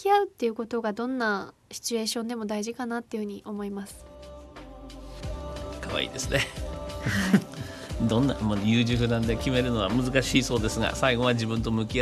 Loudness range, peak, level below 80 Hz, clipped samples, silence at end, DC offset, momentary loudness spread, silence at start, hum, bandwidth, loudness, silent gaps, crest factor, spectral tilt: 11 LU; -6 dBFS; -42 dBFS; under 0.1%; 0 s; under 0.1%; 16 LU; 0 s; none; 13 kHz; -27 LUFS; none; 20 dB; -5 dB/octave